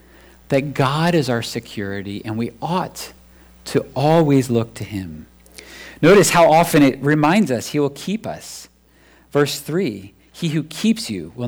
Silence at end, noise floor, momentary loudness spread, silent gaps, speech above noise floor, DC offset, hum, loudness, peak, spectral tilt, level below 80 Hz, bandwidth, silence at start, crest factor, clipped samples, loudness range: 0 s; -52 dBFS; 21 LU; none; 34 dB; under 0.1%; none; -18 LUFS; -6 dBFS; -5.5 dB/octave; -50 dBFS; over 20 kHz; 0.5 s; 14 dB; under 0.1%; 8 LU